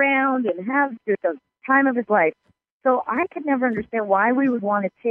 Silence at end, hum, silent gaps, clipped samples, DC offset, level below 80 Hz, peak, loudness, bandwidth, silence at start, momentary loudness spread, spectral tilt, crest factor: 0 s; none; 2.71-2.80 s; under 0.1%; under 0.1%; -64 dBFS; -4 dBFS; -21 LUFS; 3.5 kHz; 0 s; 6 LU; -9 dB/octave; 16 dB